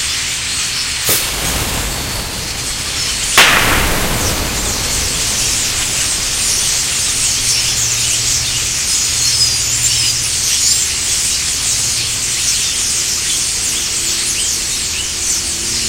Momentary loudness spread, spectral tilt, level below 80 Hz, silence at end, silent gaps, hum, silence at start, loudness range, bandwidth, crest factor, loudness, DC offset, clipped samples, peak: 5 LU; -0.5 dB/octave; -30 dBFS; 0 s; none; none; 0 s; 2 LU; 17 kHz; 16 dB; -13 LUFS; under 0.1%; under 0.1%; 0 dBFS